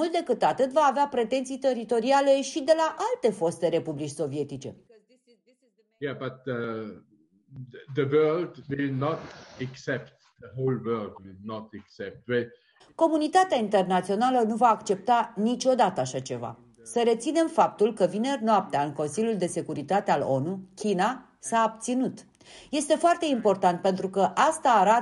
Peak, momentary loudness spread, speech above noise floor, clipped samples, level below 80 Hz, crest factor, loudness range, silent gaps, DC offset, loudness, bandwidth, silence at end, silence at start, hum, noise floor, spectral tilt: -8 dBFS; 16 LU; 42 dB; under 0.1%; -70 dBFS; 18 dB; 9 LU; none; under 0.1%; -26 LUFS; 11.5 kHz; 0 s; 0 s; none; -68 dBFS; -5 dB/octave